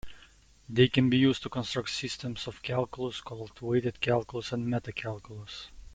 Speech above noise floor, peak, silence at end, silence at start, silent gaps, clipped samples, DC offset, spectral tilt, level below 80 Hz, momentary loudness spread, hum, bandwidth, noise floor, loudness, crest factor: 28 dB; -10 dBFS; 0 s; 0.05 s; none; under 0.1%; under 0.1%; -6 dB/octave; -56 dBFS; 18 LU; none; 9.4 kHz; -58 dBFS; -30 LUFS; 22 dB